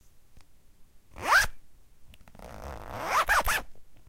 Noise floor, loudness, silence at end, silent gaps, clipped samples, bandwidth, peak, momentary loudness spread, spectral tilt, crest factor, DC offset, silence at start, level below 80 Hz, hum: -52 dBFS; -26 LUFS; 0.05 s; none; under 0.1%; 17 kHz; -12 dBFS; 20 LU; -1.5 dB/octave; 20 dB; under 0.1%; 0.15 s; -44 dBFS; none